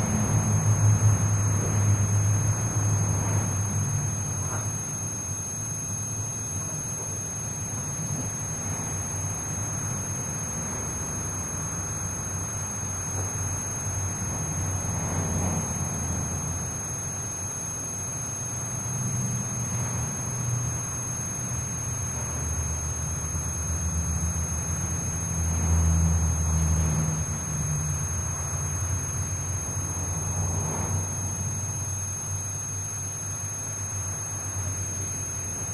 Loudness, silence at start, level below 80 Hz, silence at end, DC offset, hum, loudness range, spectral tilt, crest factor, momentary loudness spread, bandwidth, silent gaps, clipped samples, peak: -27 LUFS; 0 s; -40 dBFS; 0 s; under 0.1%; none; 4 LU; -4.5 dB/octave; 16 dB; 6 LU; 11 kHz; none; under 0.1%; -10 dBFS